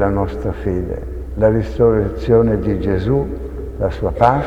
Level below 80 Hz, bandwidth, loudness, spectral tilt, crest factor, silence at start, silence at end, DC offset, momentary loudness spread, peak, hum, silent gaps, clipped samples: -28 dBFS; 8.2 kHz; -18 LUFS; -9.5 dB/octave; 16 dB; 0 s; 0 s; under 0.1%; 11 LU; 0 dBFS; none; none; under 0.1%